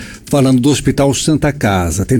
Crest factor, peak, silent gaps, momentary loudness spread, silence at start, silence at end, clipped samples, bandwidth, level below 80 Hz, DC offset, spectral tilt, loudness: 10 dB; -4 dBFS; none; 4 LU; 0 s; 0 s; under 0.1%; 18.5 kHz; -32 dBFS; under 0.1%; -5.5 dB/octave; -13 LUFS